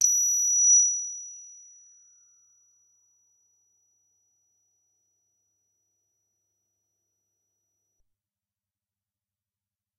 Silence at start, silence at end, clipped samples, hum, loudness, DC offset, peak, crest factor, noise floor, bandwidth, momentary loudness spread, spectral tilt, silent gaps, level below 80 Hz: 0 s; 8.5 s; under 0.1%; none; -19 LUFS; under 0.1%; -8 dBFS; 24 dB; under -90 dBFS; 12 kHz; 23 LU; 6.5 dB/octave; none; -88 dBFS